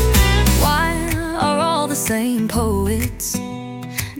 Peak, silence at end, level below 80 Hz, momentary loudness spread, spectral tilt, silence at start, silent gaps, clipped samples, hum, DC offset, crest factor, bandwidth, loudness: -2 dBFS; 0 s; -24 dBFS; 11 LU; -4.5 dB/octave; 0 s; none; under 0.1%; none; under 0.1%; 16 dB; 18 kHz; -18 LUFS